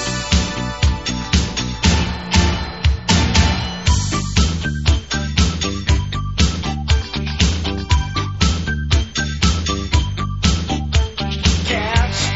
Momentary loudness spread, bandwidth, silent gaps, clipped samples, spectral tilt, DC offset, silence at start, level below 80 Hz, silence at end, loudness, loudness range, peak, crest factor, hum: 5 LU; 8.2 kHz; none; under 0.1%; -4 dB/octave; 0.5%; 0 s; -22 dBFS; 0 s; -18 LUFS; 2 LU; 0 dBFS; 18 dB; none